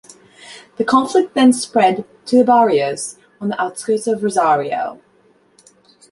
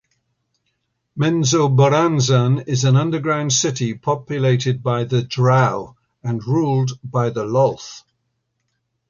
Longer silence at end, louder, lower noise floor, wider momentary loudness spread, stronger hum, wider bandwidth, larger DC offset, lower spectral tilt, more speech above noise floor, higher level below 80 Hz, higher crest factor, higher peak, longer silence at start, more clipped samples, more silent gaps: about the same, 1.2 s vs 1.1 s; about the same, -16 LUFS vs -18 LUFS; second, -55 dBFS vs -72 dBFS; first, 14 LU vs 11 LU; neither; first, 11.5 kHz vs 7.4 kHz; neither; about the same, -4.5 dB/octave vs -5.5 dB/octave; second, 39 dB vs 55 dB; second, -64 dBFS vs -56 dBFS; about the same, 16 dB vs 16 dB; about the same, -2 dBFS vs -4 dBFS; second, 0.45 s vs 1.15 s; neither; neither